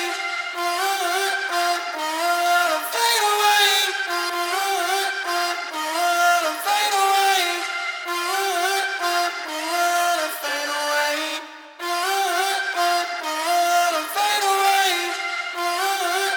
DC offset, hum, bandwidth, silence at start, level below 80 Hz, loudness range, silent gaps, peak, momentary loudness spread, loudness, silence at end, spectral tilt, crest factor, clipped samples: under 0.1%; none; over 20 kHz; 0 s; -80 dBFS; 3 LU; none; -4 dBFS; 7 LU; -21 LUFS; 0 s; 2.5 dB/octave; 18 dB; under 0.1%